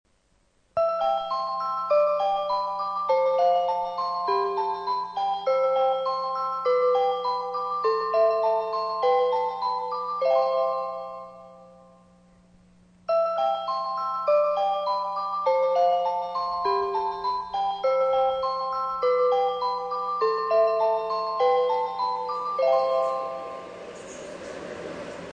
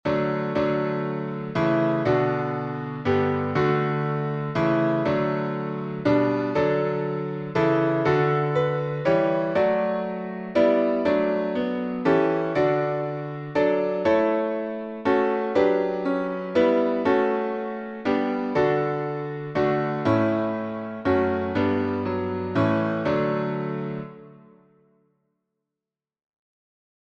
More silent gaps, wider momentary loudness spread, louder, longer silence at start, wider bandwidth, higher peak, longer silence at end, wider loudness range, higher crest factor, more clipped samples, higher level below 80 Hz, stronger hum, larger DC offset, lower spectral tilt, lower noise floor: neither; first, 11 LU vs 7 LU; about the same, -25 LUFS vs -24 LUFS; first, 0.75 s vs 0.05 s; first, 8.8 kHz vs 7.2 kHz; second, -12 dBFS vs -8 dBFS; second, 0 s vs 2.65 s; about the same, 4 LU vs 3 LU; about the same, 14 dB vs 16 dB; neither; second, -66 dBFS vs -58 dBFS; first, 60 Hz at -60 dBFS vs none; neither; second, -4 dB/octave vs -8.5 dB/octave; second, -66 dBFS vs -89 dBFS